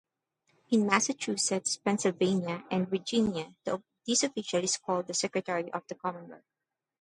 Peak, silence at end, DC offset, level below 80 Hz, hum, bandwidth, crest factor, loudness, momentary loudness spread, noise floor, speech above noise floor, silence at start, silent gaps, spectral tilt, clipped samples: -8 dBFS; 0.65 s; under 0.1%; -70 dBFS; none; 11.5 kHz; 24 dB; -30 LUFS; 10 LU; -75 dBFS; 45 dB; 0.7 s; none; -3.5 dB/octave; under 0.1%